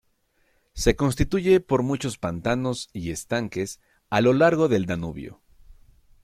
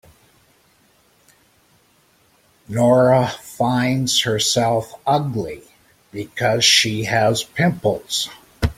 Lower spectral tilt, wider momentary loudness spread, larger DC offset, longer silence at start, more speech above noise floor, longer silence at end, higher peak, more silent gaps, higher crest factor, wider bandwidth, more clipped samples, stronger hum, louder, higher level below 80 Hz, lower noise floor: first, -5.5 dB/octave vs -4 dB/octave; about the same, 15 LU vs 15 LU; neither; second, 0.75 s vs 2.7 s; first, 44 dB vs 39 dB; first, 0.5 s vs 0.05 s; about the same, -4 dBFS vs -2 dBFS; neither; about the same, 20 dB vs 18 dB; about the same, 15 kHz vs 16.5 kHz; neither; neither; second, -24 LUFS vs -18 LUFS; about the same, -42 dBFS vs -44 dBFS; first, -67 dBFS vs -58 dBFS